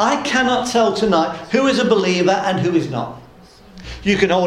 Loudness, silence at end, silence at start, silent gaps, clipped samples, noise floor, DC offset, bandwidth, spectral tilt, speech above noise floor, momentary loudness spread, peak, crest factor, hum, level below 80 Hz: -17 LUFS; 0 s; 0 s; none; under 0.1%; -44 dBFS; under 0.1%; 12.5 kHz; -4.5 dB/octave; 27 dB; 10 LU; -2 dBFS; 16 dB; none; -44 dBFS